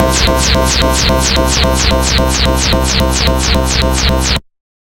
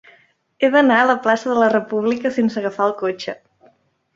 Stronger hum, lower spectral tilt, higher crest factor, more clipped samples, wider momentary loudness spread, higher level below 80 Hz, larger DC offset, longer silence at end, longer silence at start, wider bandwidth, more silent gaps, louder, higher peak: neither; second, -3.5 dB/octave vs -5.5 dB/octave; second, 12 dB vs 18 dB; neither; second, 2 LU vs 11 LU; first, -16 dBFS vs -66 dBFS; neither; second, 0.55 s vs 0.8 s; second, 0 s vs 0.6 s; first, 17 kHz vs 7.8 kHz; neither; first, -11 LUFS vs -17 LUFS; about the same, 0 dBFS vs -2 dBFS